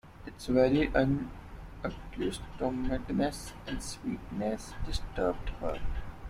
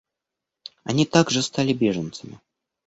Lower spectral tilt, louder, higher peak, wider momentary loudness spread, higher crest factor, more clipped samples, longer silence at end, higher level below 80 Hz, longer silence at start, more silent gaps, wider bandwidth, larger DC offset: about the same, -6 dB/octave vs -5 dB/octave; second, -33 LUFS vs -22 LUFS; second, -12 dBFS vs -2 dBFS; second, 15 LU vs 21 LU; about the same, 20 dB vs 22 dB; neither; second, 0 s vs 0.5 s; first, -42 dBFS vs -60 dBFS; second, 0.05 s vs 0.85 s; neither; first, 15.5 kHz vs 8.2 kHz; neither